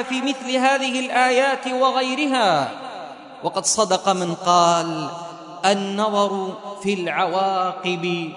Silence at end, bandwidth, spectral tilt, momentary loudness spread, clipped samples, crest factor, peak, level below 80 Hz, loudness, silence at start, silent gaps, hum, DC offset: 0 s; 11 kHz; -3 dB/octave; 12 LU; under 0.1%; 18 dB; -2 dBFS; -70 dBFS; -20 LUFS; 0 s; none; none; under 0.1%